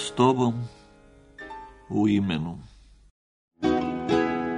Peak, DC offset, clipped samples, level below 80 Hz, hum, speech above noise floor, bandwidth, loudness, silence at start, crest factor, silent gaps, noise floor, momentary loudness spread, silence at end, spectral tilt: -6 dBFS; under 0.1%; under 0.1%; -52 dBFS; none; 30 dB; 10.5 kHz; -25 LUFS; 0 s; 20 dB; 3.11-3.48 s; -53 dBFS; 20 LU; 0 s; -6.5 dB/octave